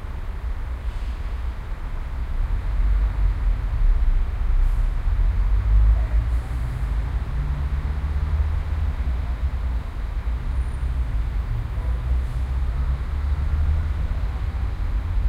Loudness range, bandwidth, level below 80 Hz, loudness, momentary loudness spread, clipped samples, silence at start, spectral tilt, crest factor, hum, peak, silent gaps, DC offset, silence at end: 4 LU; 5.2 kHz; -22 dBFS; -26 LUFS; 8 LU; under 0.1%; 0 s; -7.5 dB/octave; 14 dB; none; -8 dBFS; none; under 0.1%; 0 s